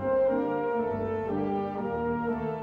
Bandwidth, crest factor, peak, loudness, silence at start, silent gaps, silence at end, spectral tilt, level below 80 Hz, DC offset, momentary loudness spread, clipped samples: 5.2 kHz; 12 dB; -18 dBFS; -29 LUFS; 0 s; none; 0 s; -9.5 dB/octave; -54 dBFS; under 0.1%; 5 LU; under 0.1%